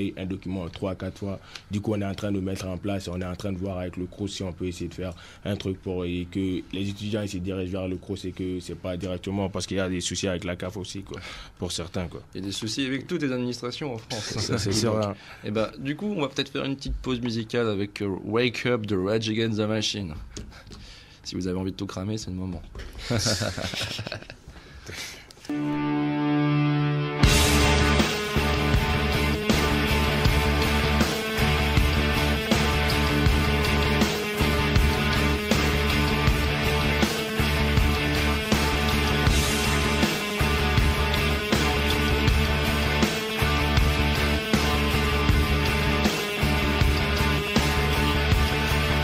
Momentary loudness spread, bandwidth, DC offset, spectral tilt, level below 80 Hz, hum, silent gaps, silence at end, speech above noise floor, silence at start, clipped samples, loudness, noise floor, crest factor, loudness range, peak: 11 LU; 16 kHz; under 0.1%; -5 dB/octave; -32 dBFS; none; none; 0 s; 17 dB; 0 s; under 0.1%; -25 LUFS; -46 dBFS; 20 dB; 8 LU; -6 dBFS